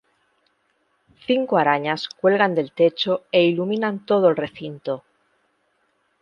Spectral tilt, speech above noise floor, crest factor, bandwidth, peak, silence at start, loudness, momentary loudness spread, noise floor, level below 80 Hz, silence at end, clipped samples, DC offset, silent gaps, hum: -7 dB/octave; 47 dB; 20 dB; 7.2 kHz; -2 dBFS; 1.3 s; -21 LUFS; 12 LU; -68 dBFS; -70 dBFS; 1.2 s; under 0.1%; under 0.1%; none; none